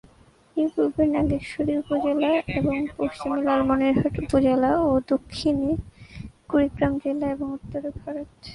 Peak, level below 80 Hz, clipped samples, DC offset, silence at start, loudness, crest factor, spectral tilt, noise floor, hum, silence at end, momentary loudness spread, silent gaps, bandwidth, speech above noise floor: -8 dBFS; -44 dBFS; under 0.1%; under 0.1%; 0.55 s; -24 LUFS; 16 dB; -7.5 dB/octave; -55 dBFS; none; 0 s; 12 LU; none; 11 kHz; 32 dB